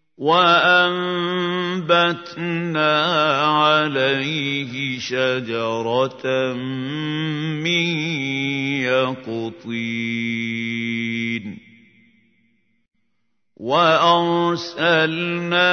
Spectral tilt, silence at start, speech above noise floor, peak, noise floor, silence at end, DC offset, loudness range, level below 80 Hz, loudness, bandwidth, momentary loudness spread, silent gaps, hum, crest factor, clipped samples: -5 dB/octave; 0.2 s; 56 dB; -2 dBFS; -75 dBFS; 0 s; under 0.1%; 8 LU; -70 dBFS; -19 LUFS; 6.6 kHz; 10 LU; none; none; 18 dB; under 0.1%